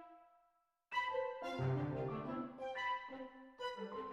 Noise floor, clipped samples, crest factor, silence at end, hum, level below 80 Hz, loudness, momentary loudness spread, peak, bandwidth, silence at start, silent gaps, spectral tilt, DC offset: -79 dBFS; under 0.1%; 16 dB; 0 s; none; -72 dBFS; -43 LUFS; 11 LU; -26 dBFS; 8.8 kHz; 0 s; none; -7 dB/octave; under 0.1%